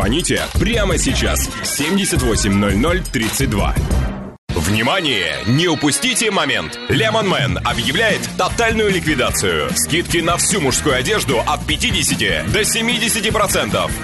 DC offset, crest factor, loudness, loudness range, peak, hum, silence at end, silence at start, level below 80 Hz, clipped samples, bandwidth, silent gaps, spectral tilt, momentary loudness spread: under 0.1%; 12 dB; -16 LUFS; 2 LU; -6 dBFS; none; 0 s; 0 s; -28 dBFS; under 0.1%; 12.5 kHz; 4.38-4.48 s; -3.5 dB/octave; 4 LU